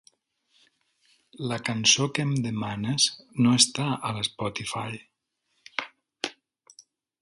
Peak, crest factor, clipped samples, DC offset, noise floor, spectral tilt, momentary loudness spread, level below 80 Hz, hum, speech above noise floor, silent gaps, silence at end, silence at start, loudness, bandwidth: -6 dBFS; 24 dB; under 0.1%; under 0.1%; -76 dBFS; -3 dB/octave; 15 LU; -64 dBFS; none; 50 dB; none; 0.4 s; 1.4 s; -25 LUFS; 11.5 kHz